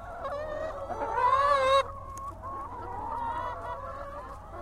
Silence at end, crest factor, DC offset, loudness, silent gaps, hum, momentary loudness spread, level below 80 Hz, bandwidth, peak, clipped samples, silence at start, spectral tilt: 0 s; 18 dB; under 0.1%; -30 LUFS; none; none; 16 LU; -48 dBFS; 14.5 kHz; -12 dBFS; under 0.1%; 0 s; -4 dB/octave